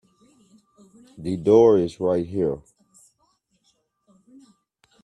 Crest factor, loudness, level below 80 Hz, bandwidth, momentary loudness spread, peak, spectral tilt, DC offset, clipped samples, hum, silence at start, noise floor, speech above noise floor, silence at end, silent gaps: 20 dB; -20 LUFS; -58 dBFS; 10 kHz; 17 LU; -4 dBFS; -8 dB/octave; under 0.1%; under 0.1%; none; 1.2 s; -69 dBFS; 49 dB; 2.45 s; none